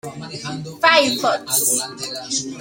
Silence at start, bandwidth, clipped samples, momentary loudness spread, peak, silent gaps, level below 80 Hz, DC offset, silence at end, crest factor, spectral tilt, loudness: 0.05 s; 17 kHz; under 0.1%; 15 LU; 0 dBFS; none; -62 dBFS; under 0.1%; 0 s; 20 dB; -1.5 dB/octave; -17 LUFS